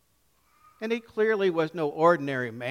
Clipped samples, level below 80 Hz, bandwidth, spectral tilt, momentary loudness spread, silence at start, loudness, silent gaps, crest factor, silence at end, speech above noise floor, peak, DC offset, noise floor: under 0.1%; -72 dBFS; 14 kHz; -6.5 dB/octave; 9 LU; 0.8 s; -26 LUFS; none; 20 dB; 0 s; 42 dB; -8 dBFS; under 0.1%; -68 dBFS